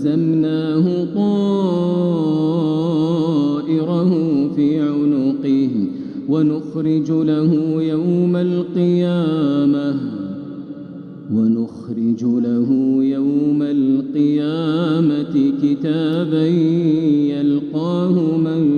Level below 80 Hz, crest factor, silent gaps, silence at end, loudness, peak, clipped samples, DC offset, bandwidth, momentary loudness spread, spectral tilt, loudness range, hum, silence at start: -64 dBFS; 12 dB; none; 0 s; -17 LUFS; -6 dBFS; under 0.1%; under 0.1%; 6.8 kHz; 5 LU; -9.5 dB/octave; 2 LU; none; 0 s